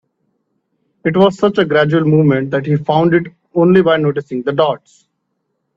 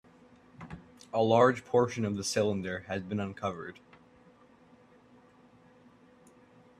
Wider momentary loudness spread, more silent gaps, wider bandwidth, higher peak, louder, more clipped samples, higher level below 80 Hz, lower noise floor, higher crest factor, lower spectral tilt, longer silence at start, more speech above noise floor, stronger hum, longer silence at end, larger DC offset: second, 8 LU vs 24 LU; neither; second, 7.6 kHz vs 13.5 kHz; first, 0 dBFS vs -10 dBFS; first, -14 LUFS vs -30 LUFS; neither; first, -56 dBFS vs -68 dBFS; first, -70 dBFS vs -60 dBFS; second, 14 dB vs 24 dB; first, -8 dB/octave vs -5.5 dB/octave; first, 1.05 s vs 0.6 s; first, 57 dB vs 31 dB; neither; second, 1 s vs 3.05 s; neither